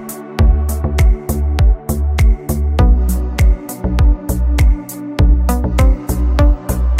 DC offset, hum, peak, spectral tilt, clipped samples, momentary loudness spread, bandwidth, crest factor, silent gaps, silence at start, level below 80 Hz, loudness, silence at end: under 0.1%; none; -2 dBFS; -6.5 dB/octave; under 0.1%; 5 LU; 16 kHz; 10 dB; none; 0 s; -14 dBFS; -15 LUFS; 0 s